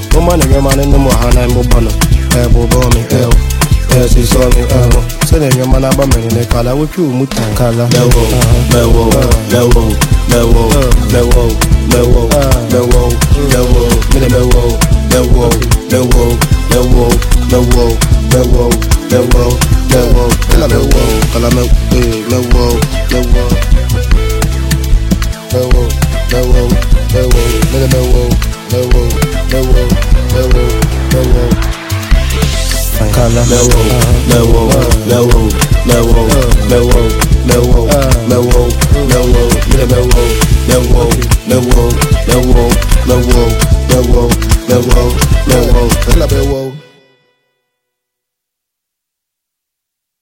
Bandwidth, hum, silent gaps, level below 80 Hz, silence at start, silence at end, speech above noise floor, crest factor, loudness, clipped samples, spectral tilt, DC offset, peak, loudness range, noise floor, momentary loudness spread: 17 kHz; none; none; -10 dBFS; 0 s; 3.4 s; 69 dB; 8 dB; -10 LUFS; 2%; -5.5 dB/octave; under 0.1%; 0 dBFS; 3 LU; -76 dBFS; 4 LU